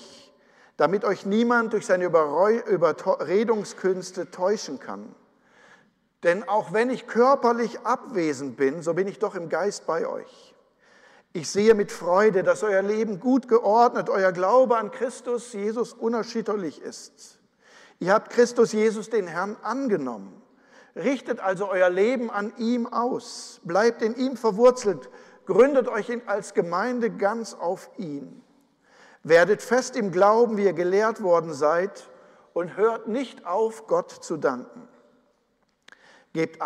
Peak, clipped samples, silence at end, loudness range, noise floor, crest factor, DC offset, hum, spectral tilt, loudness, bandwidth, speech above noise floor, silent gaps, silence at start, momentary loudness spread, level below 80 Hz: -6 dBFS; under 0.1%; 0 s; 7 LU; -69 dBFS; 18 dB; under 0.1%; none; -5 dB/octave; -24 LUFS; 12 kHz; 46 dB; none; 0 s; 13 LU; -70 dBFS